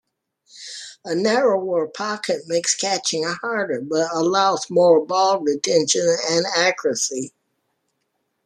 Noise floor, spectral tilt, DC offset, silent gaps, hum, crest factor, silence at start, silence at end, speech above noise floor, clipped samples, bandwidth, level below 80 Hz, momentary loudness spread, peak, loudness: -73 dBFS; -2.5 dB/octave; under 0.1%; none; none; 18 dB; 0.55 s; 1.2 s; 53 dB; under 0.1%; 12.5 kHz; -70 dBFS; 10 LU; -4 dBFS; -20 LUFS